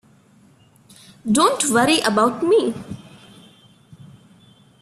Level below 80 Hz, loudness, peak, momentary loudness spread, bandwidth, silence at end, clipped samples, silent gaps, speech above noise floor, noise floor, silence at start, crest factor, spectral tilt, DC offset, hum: -60 dBFS; -17 LUFS; -4 dBFS; 18 LU; 14 kHz; 1.85 s; under 0.1%; none; 35 dB; -53 dBFS; 1.25 s; 18 dB; -3.5 dB/octave; under 0.1%; none